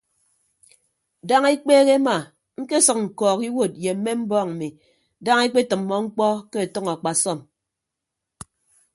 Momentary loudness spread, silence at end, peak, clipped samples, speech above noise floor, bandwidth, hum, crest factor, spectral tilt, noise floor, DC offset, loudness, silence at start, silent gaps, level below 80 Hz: 14 LU; 1.55 s; -2 dBFS; under 0.1%; 63 dB; 11.5 kHz; none; 20 dB; -3.5 dB/octave; -83 dBFS; under 0.1%; -20 LUFS; 1.25 s; none; -66 dBFS